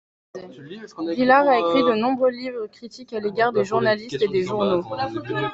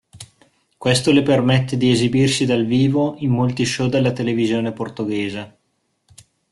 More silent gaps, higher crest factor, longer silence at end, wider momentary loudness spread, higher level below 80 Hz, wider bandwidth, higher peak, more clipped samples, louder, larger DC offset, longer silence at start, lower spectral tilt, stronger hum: neither; about the same, 18 dB vs 16 dB; second, 0 s vs 1.05 s; first, 22 LU vs 10 LU; second, -62 dBFS vs -52 dBFS; second, 8 kHz vs 12 kHz; about the same, -2 dBFS vs -4 dBFS; neither; second, -21 LUFS vs -18 LUFS; neither; first, 0.35 s vs 0.15 s; about the same, -6 dB/octave vs -5.5 dB/octave; neither